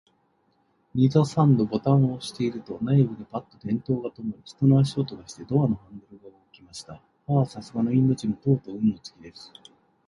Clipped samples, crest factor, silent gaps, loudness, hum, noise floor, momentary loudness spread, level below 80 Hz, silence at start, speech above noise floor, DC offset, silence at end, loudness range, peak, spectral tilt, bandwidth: under 0.1%; 18 dB; none; -24 LUFS; none; -67 dBFS; 21 LU; -58 dBFS; 0.95 s; 43 dB; under 0.1%; 0.8 s; 4 LU; -6 dBFS; -8.5 dB/octave; 11 kHz